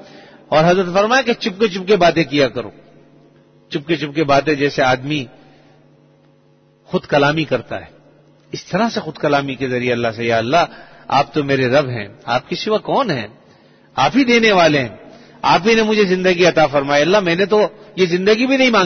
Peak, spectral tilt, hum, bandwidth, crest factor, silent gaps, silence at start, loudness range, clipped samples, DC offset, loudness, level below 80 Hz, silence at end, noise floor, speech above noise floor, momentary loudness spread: -2 dBFS; -5 dB/octave; none; 6.6 kHz; 16 dB; none; 0.15 s; 6 LU; under 0.1%; under 0.1%; -16 LUFS; -50 dBFS; 0 s; -53 dBFS; 37 dB; 11 LU